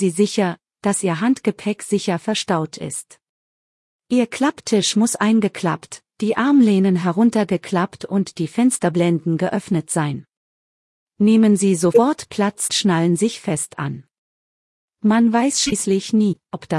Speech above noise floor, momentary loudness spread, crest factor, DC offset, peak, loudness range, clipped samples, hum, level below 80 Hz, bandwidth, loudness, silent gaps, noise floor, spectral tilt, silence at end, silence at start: over 72 dB; 10 LU; 16 dB; under 0.1%; -2 dBFS; 4 LU; under 0.1%; none; -60 dBFS; 12 kHz; -19 LUFS; 3.29-3.99 s, 10.37-11.07 s, 14.18-14.88 s; under -90 dBFS; -5 dB/octave; 0 s; 0 s